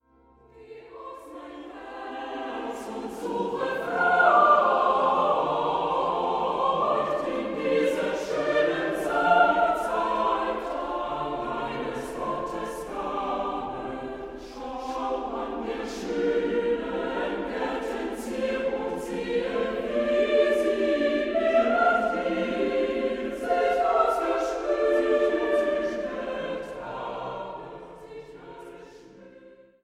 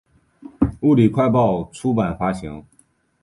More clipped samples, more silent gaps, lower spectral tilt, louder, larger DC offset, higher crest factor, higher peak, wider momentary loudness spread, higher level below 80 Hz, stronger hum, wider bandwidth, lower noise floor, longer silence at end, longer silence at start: neither; neither; second, -5 dB/octave vs -8.5 dB/octave; second, -26 LUFS vs -19 LUFS; neither; about the same, 20 dB vs 16 dB; about the same, -6 dBFS vs -4 dBFS; first, 16 LU vs 13 LU; second, -54 dBFS vs -42 dBFS; neither; first, 15 kHz vs 11.5 kHz; about the same, -58 dBFS vs -59 dBFS; second, 0.3 s vs 0.6 s; about the same, 0.55 s vs 0.6 s